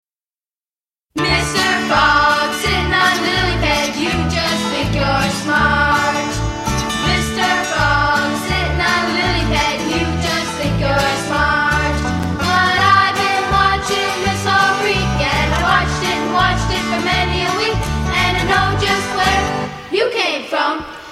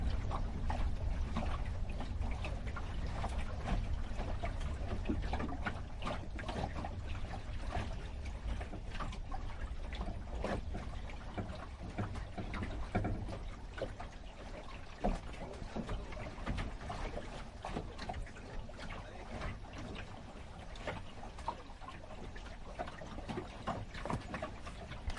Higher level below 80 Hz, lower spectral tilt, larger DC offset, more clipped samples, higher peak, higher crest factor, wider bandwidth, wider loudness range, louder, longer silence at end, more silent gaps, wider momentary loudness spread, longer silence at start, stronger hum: first, -28 dBFS vs -44 dBFS; second, -4 dB/octave vs -6.5 dB/octave; neither; neither; first, 0 dBFS vs -22 dBFS; about the same, 16 dB vs 18 dB; first, 16 kHz vs 11 kHz; second, 2 LU vs 6 LU; first, -15 LUFS vs -44 LUFS; about the same, 0 s vs 0 s; neither; second, 5 LU vs 9 LU; first, 1.15 s vs 0 s; neither